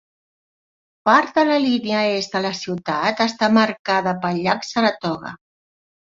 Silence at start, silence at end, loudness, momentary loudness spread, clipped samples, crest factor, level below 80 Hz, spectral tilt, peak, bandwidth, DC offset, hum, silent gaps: 1.05 s; 0.75 s; -19 LUFS; 9 LU; under 0.1%; 20 dB; -62 dBFS; -5 dB/octave; 0 dBFS; 7.6 kHz; under 0.1%; none; 3.79-3.85 s